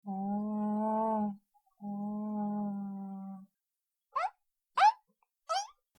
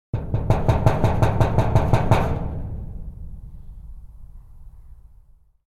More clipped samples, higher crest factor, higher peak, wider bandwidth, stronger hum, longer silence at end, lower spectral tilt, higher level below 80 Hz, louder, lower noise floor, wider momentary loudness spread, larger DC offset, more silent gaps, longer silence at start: neither; about the same, 20 dB vs 22 dB; second, -14 dBFS vs 0 dBFS; second, 11 kHz vs 13 kHz; neither; second, 0.3 s vs 0.75 s; second, -5.5 dB/octave vs -8 dB/octave; second, -82 dBFS vs -30 dBFS; second, -34 LUFS vs -21 LUFS; first, -89 dBFS vs -52 dBFS; second, 19 LU vs 23 LU; neither; neither; about the same, 0.05 s vs 0.15 s